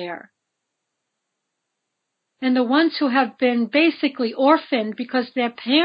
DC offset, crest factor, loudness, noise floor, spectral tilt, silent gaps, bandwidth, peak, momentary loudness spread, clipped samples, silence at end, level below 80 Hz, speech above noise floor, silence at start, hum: under 0.1%; 20 dB; -20 LUFS; -79 dBFS; -7.5 dB/octave; none; 5.2 kHz; -2 dBFS; 7 LU; under 0.1%; 0 s; -82 dBFS; 59 dB; 0 s; none